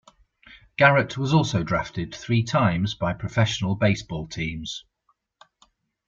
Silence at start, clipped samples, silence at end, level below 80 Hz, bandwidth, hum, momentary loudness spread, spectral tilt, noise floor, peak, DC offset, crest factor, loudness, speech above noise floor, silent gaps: 0.5 s; under 0.1%; 1.25 s; -50 dBFS; 7.6 kHz; none; 15 LU; -6 dB/octave; -70 dBFS; -2 dBFS; under 0.1%; 22 dB; -23 LUFS; 47 dB; none